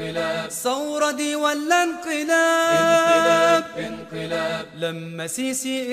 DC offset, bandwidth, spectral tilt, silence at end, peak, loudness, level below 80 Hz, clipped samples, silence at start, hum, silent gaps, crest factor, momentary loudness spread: under 0.1%; 15.5 kHz; -3 dB/octave; 0 s; -6 dBFS; -21 LUFS; -62 dBFS; under 0.1%; 0 s; none; none; 14 dB; 13 LU